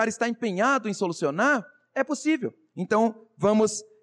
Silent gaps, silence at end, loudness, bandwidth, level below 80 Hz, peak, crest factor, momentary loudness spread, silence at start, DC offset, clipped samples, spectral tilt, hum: none; 0.2 s; -25 LUFS; 11 kHz; -74 dBFS; -12 dBFS; 14 dB; 7 LU; 0 s; under 0.1%; under 0.1%; -4.5 dB/octave; none